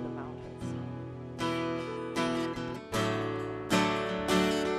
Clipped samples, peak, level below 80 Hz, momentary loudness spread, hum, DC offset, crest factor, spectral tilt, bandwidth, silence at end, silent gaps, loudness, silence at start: under 0.1%; -14 dBFS; -56 dBFS; 13 LU; none; under 0.1%; 18 dB; -5 dB/octave; 15 kHz; 0 s; none; -32 LUFS; 0 s